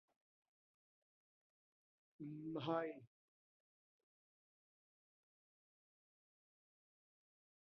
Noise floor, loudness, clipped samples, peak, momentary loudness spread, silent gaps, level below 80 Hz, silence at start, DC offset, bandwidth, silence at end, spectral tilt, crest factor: under -90 dBFS; -46 LUFS; under 0.1%; -28 dBFS; 14 LU; none; under -90 dBFS; 2.2 s; under 0.1%; 4.2 kHz; 4.7 s; -5 dB/octave; 26 dB